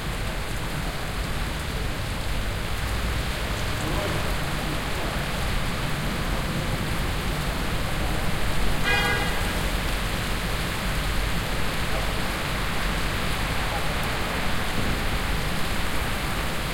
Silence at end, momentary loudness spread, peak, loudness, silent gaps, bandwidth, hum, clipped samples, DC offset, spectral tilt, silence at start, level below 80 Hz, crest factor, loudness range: 0 s; 3 LU; -10 dBFS; -27 LUFS; none; 16.5 kHz; none; under 0.1%; under 0.1%; -4 dB/octave; 0 s; -30 dBFS; 16 dB; 2 LU